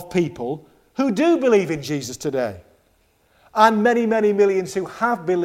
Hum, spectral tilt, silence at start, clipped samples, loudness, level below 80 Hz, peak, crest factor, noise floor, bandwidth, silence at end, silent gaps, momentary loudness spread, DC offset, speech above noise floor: none; -5.5 dB/octave; 0 s; under 0.1%; -20 LUFS; -58 dBFS; 0 dBFS; 20 dB; -61 dBFS; 15.5 kHz; 0 s; none; 12 LU; under 0.1%; 42 dB